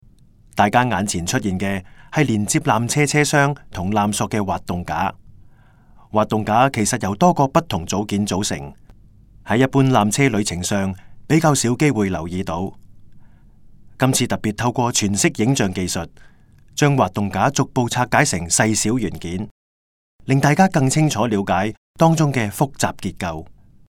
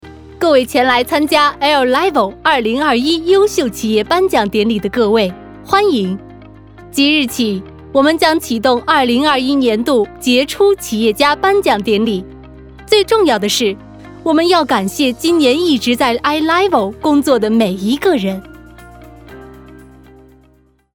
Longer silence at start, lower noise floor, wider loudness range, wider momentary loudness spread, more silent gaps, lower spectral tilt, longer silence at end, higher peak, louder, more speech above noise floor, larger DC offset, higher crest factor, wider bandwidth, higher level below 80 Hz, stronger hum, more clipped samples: first, 0.55 s vs 0.05 s; about the same, -49 dBFS vs -52 dBFS; about the same, 3 LU vs 3 LU; first, 11 LU vs 6 LU; first, 19.51-20.19 s, 21.77-21.94 s vs none; about the same, -5 dB/octave vs -4 dB/octave; second, 0.35 s vs 1.2 s; about the same, 0 dBFS vs 0 dBFS; second, -19 LUFS vs -13 LUFS; second, 31 dB vs 39 dB; neither; first, 20 dB vs 14 dB; second, 17.5 kHz vs over 20 kHz; about the same, -48 dBFS vs -44 dBFS; neither; neither